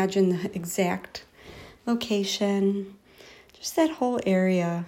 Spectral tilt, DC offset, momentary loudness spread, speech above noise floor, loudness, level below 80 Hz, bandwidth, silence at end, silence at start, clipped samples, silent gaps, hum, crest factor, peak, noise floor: -5.5 dB/octave; under 0.1%; 18 LU; 26 dB; -26 LUFS; -62 dBFS; 16 kHz; 0 s; 0 s; under 0.1%; none; none; 16 dB; -10 dBFS; -51 dBFS